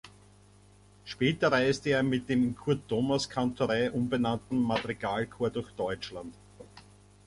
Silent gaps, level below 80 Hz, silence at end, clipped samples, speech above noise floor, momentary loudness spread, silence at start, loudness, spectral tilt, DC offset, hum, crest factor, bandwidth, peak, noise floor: none; -58 dBFS; 0.45 s; under 0.1%; 29 dB; 10 LU; 0.05 s; -30 LUFS; -6 dB/octave; under 0.1%; 50 Hz at -50 dBFS; 18 dB; 11.5 kHz; -12 dBFS; -58 dBFS